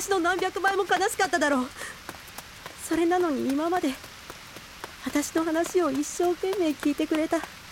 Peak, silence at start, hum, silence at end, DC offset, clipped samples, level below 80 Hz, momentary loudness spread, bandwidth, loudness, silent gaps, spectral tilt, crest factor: -10 dBFS; 0 s; none; 0 s; under 0.1%; under 0.1%; -56 dBFS; 17 LU; 17 kHz; -26 LUFS; none; -3 dB/octave; 16 dB